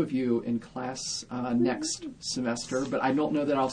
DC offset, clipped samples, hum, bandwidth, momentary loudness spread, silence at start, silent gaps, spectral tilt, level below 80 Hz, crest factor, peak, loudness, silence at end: under 0.1%; under 0.1%; none; 10 kHz; 7 LU; 0 s; none; -4.5 dB/octave; -60 dBFS; 16 dB; -14 dBFS; -29 LUFS; 0 s